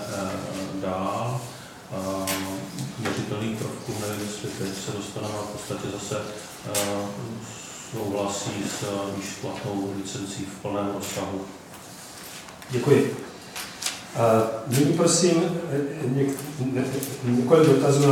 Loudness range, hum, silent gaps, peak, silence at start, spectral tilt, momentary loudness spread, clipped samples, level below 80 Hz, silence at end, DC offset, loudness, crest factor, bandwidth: 8 LU; none; none; -4 dBFS; 0 s; -5 dB/octave; 16 LU; under 0.1%; -62 dBFS; 0 s; under 0.1%; -26 LUFS; 22 dB; 18 kHz